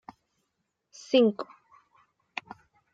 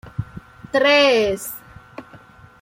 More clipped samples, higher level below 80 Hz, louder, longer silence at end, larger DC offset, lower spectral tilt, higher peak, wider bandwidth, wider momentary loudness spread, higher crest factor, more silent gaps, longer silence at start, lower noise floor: neither; second, -80 dBFS vs -50 dBFS; second, -26 LUFS vs -17 LUFS; first, 1.5 s vs 0.45 s; neither; about the same, -5 dB/octave vs -4 dB/octave; second, -10 dBFS vs -4 dBFS; second, 7.8 kHz vs 16.5 kHz; second, 20 LU vs 26 LU; first, 22 dB vs 16 dB; neither; first, 1.1 s vs 0.05 s; first, -80 dBFS vs -45 dBFS